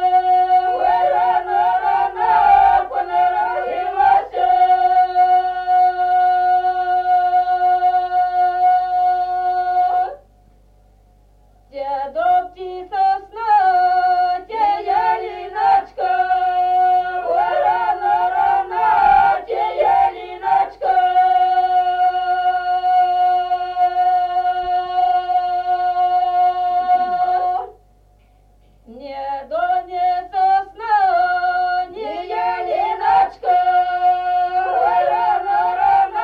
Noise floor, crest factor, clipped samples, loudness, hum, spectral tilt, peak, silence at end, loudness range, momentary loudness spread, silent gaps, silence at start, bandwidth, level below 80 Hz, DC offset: -52 dBFS; 14 dB; under 0.1%; -17 LUFS; 50 Hz at -55 dBFS; -5 dB/octave; -4 dBFS; 0 s; 6 LU; 7 LU; none; 0 s; 5 kHz; -50 dBFS; under 0.1%